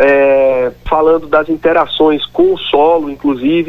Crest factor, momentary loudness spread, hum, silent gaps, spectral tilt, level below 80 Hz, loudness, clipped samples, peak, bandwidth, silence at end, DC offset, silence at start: 10 dB; 5 LU; none; none; -7 dB/octave; -38 dBFS; -12 LUFS; under 0.1%; 0 dBFS; 6 kHz; 0 s; under 0.1%; 0 s